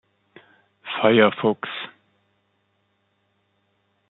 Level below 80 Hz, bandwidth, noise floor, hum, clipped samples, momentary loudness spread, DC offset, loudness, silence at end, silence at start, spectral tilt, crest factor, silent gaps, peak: -72 dBFS; 4.1 kHz; -69 dBFS; none; under 0.1%; 20 LU; under 0.1%; -20 LUFS; 2.25 s; 0.85 s; -3 dB/octave; 24 dB; none; -2 dBFS